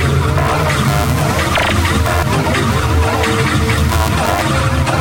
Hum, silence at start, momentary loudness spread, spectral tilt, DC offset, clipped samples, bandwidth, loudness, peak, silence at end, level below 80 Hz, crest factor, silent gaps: none; 0 s; 1 LU; -5 dB/octave; under 0.1%; under 0.1%; 17.5 kHz; -14 LUFS; -2 dBFS; 0 s; -22 dBFS; 12 dB; none